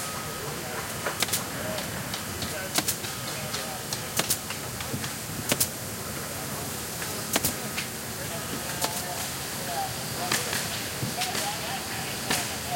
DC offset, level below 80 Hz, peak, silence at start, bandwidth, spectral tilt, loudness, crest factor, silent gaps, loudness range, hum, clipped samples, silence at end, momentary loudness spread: under 0.1%; -54 dBFS; -8 dBFS; 0 s; 17 kHz; -2 dB/octave; -29 LUFS; 24 dB; none; 1 LU; none; under 0.1%; 0 s; 6 LU